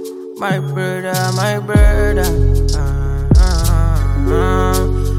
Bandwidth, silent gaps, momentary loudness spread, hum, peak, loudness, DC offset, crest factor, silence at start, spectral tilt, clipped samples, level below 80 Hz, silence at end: 16 kHz; none; 7 LU; none; 0 dBFS; -15 LUFS; under 0.1%; 12 dB; 0 s; -6 dB/octave; under 0.1%; -16 dBFS; 0 s